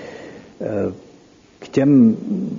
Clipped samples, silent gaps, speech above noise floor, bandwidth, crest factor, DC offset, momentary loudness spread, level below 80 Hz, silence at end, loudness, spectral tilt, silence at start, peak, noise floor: under 0.1%; none; 33 dB; 7.4 kHz; 16 dB; under 0.1%; 23 LU; -60 dBFS; 0 s; -17 LUFS; -8.5 dB/octave; 0 s; -4 dBFS; -49 dBFS